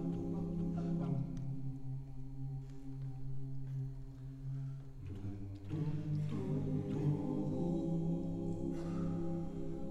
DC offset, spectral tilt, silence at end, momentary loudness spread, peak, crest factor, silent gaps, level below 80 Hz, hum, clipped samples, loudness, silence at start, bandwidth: under 0.1%; -10 dB/octave; 0 s; 10 LU; -24 dBFS; 16 dB; none; -52 dBFS; none; under 0.1%; -41 LUFS; 0 s; 8.2 kHz